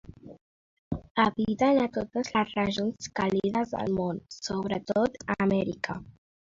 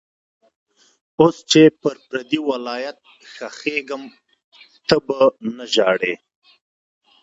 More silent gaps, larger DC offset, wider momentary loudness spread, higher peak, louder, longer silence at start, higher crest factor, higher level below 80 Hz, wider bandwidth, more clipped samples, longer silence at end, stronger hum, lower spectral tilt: first, 0.41-0.91 s, 1.11-1.15 s vs 4.44-4.52 s; neither; second, 9 LU vs 19 LU; second, -10 dBFS vs 0 dBFS; second, -28 LUFS vs -18 LUFS; second, 0.05 s vs 1.2 s; about the same, 18 dB vs 20 dB; about the same, -56 dBFS vs -60 dBFS; about the same, 7.6 kHz vs 8 kHz; neither; second, 0.35 s vs 1.05 s; neither; about the same, -5.5 dB/octave vs -4.5 dB/octave